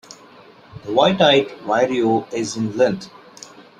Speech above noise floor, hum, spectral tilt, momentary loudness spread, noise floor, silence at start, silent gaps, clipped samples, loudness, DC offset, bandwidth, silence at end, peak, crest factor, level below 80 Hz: 28 dB; none; -4.5 dB/octave; 25 LU; -46 dBFS; 0.1 s; none; under 0.1%; -18 LUFS; under 0.1%; 10.5 kHz; 0.2 s; -2 dBFS; 18 dB; -60 dBFS